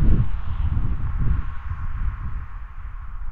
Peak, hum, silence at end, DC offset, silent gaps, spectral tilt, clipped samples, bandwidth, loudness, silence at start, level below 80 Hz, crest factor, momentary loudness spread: -4 dBFS; none; 0 s; under 0.1%; none; -10.5 dB/octave; under 0.1%; 3.5 kHz; -28 LUFS; 0 s; -24 dBFS; 18 dB; 14 LU